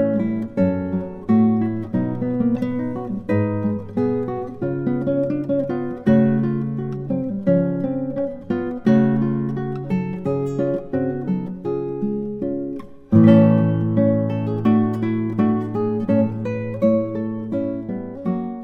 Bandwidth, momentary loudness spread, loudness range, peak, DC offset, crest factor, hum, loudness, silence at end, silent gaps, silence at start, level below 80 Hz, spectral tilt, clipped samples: 4.4 kHz; 9 LU; 5 LU; 0 dBFS; under 0.1%; 18 dB; none; -21 LUFS; 0 s; none; 0 s; -50 dBFS; -10.5 dB/octave; under 0.1%